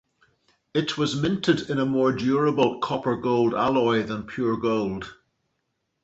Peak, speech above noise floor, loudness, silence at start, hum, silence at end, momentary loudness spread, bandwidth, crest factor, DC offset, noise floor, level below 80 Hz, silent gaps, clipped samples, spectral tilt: -6 dBFS; 53 dB; -24 LUFS; 0.75 s; none; 0.9 s; 6 LU; 8.2 kHz; 18 dB; under 0.1%; -76 dBFS; -56 dBFS; none; under 0.1%; -6 dB/octave